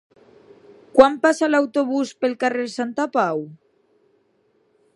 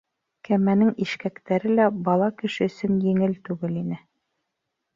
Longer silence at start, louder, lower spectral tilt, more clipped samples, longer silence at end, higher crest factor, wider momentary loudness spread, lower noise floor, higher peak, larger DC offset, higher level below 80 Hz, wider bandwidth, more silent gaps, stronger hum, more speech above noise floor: first, 0.95 s vs 0.5 s; first, -20 LUFS vs -23 LUFS; second, -4.5 dB/octave vs -8 dB/octave; neither; first, 1.4 s vs 1 s; first, 22 dB vs 16 dB; about the same, 10 LU vs 10 LU; second, -63 dBFS vs -80 dBFS; first, 0 dBFS vs -8 dBFS; neither; about the same, -62 dBFS vs -64 dBFS; first, 11.5 kHz vs 7.4 kHz; neither; neither; second, 44 dB vs 58 dB